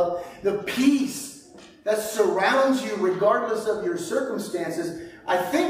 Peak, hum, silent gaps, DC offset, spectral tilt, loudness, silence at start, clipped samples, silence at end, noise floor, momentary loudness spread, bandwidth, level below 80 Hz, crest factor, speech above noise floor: -8 dBFS; none; none; under 0.1%; -4 dB/octave; -24 LUFS; 0 s; under 0.1%; 0 s; -47 dBFS; 12 LU; 16 kHz; -62 dBFS; 16 dB; 24 dB